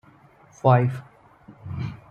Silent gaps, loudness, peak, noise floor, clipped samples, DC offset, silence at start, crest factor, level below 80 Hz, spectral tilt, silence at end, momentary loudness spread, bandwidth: none; -23 LUFS; -4 dBFS; -53 dBFS; under 0.1%; under 0.1%; 0.65 s; 22 dB; -58 dBFS; -9 dB/octave; 0.15 s; 19 LU; 6.8 kHz